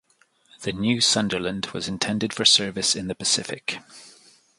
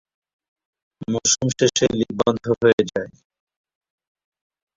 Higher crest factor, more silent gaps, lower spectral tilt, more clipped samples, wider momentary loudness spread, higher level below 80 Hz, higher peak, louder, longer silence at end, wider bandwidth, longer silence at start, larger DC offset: about the same, 22 dB vs 20 dB; second, none vs 2.73-2.78 s; about the same, -2.5 dB/octave vs -3.5 dB/octave; neither; first, 14 LU vs 11 LU; about the same, -56 dBFS vs -54 dBFS; about the same, -4 dBFS vs -4 dBFS; about the same, -22 LUFS vs -20 LUFS; second, 0.5 s vs 1.7 s; first, 11.5 kHz vs 7.8 kHz; second, 0.6 s vs 1 s; neither